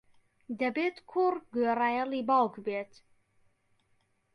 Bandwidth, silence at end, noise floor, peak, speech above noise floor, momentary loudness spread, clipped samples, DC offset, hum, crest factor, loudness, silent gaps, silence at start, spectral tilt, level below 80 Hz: 10.5 kHz; 1.5 s; -72 dBFS; -14 dBFS; 42 dB; 10 LU; under 0.1%; under 0.1%; none; 18 dB; -30 LUFS; none; 0.5 s; -6.5 dB/octave; -78 dBFS